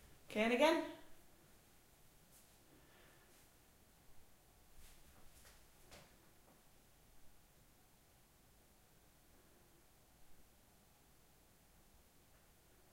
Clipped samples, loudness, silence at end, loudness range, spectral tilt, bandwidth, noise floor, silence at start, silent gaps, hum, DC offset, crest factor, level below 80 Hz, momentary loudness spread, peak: under 0.1%; -37 LUFS; 2.6 s; 26 LU; -4 dB/octave; 16 kHz; -69 dBFS; 0.3 s; none; none; under 0.1%; 28 dB; -72 dBFS; 33 LU; -22 dBFS